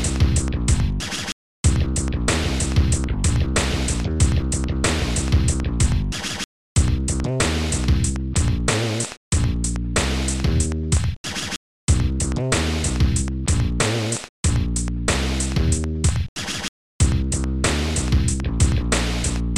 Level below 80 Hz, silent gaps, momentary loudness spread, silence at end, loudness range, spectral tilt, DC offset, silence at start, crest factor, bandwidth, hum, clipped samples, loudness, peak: -24 dBFS; 1.32-1.64 s, 6.44-6.76 s, 9.17-9.31 s, 11.17-11.24 s, 11.56-11.88 s, 14.29-14.43 s, 16.29-16.36 s, 16.68-16.99 s; 6 LU; 0 s; 1 LU; -4.5 dB/octave; 0.7%; 0 s; 16 dB; 13 kHz; none; under 0.1%; -22 LUFS; -4 dBFS